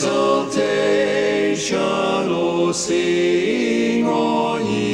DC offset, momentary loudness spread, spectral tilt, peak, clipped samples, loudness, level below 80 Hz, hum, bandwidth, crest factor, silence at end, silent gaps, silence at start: under 0.1%; 2 LU; -4.5 dB/octave; -6 dBFS; under 0.1%; -18 LUFS; -56 dBFS; none; 11.5 kHz; 12 dB; 0 s; none; 0 s